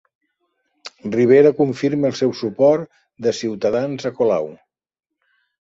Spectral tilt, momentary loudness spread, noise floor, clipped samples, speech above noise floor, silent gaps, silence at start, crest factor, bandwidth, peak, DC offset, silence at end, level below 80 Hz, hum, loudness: -6.5 dB/octave; 19 LU; -71 dBFS; under 0.1%; 53 dB; none; 0.85 s; 18 dB; 7.8 kHz; -2 dBFS; under 0.1%; 1.1 s; -62 dBFS; none; -18 LUFS